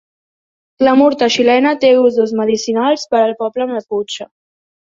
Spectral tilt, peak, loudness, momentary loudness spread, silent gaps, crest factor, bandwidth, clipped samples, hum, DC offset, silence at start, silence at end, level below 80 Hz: -4 dB/octave; -2 dBFS; -13 LUFS; 10 LU; none; 12 dB; 7.6 kHz; under 0.1%; none; under 0.1%; 0.8 s; 0.6 s; -60 dBFS